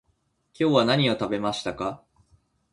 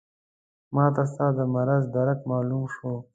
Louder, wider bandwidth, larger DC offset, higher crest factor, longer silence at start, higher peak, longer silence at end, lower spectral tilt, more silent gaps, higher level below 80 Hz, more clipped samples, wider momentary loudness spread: about the same, -24 LUFS vs -25 LUFS; first, 11.5 kHz vs 7.8 kHz; neither; about the same, 22 dB vs 20 dB; about the same, 0.6 s vs 0.7 s; about the same, -6 dBFS vs -6 dBFS; first, 0.75 s vs 0.1 s; second, -5.5 dB/octave vs -11 dB/octave; neither; first, -58 dBFS vs -64 dBFS; neither; first, 12 LU vs 7 LU